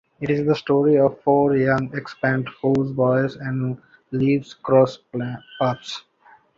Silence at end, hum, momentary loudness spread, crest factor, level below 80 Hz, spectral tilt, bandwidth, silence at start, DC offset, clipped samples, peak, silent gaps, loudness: 0.6 s; none; 12 LU; 16 dB; -56 dBFS; -8 dB/octave; 7.6 kHz; 0.2 s; under 0.1%; under 0.1%; -4 dBFS; none; -21 LUFS